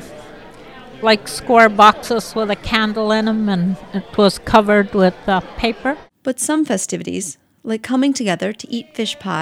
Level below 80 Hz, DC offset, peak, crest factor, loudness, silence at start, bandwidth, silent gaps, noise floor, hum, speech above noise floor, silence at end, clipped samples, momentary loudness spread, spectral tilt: -44 dBFS; under 0.1%; 0 dBFS; 18 dB; -17 LUFS; 0 s; 16 kHz; none; -38 dBFS; none; 22 dB; 0 s; under 0.1%; 14 LU; -4.5 dB/octave